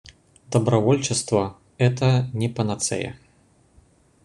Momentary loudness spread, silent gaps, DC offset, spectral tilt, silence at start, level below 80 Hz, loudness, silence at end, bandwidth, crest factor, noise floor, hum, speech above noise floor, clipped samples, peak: 8 LU; none; under 0.1%; -5.5 dB/octave; 0.5 s; -54 dBFS; -22 LUFS; 1.1 s; 11 kHz; 18 dB; -58 dBFS; none; 37 dB; under 0.1%; -4 dBFS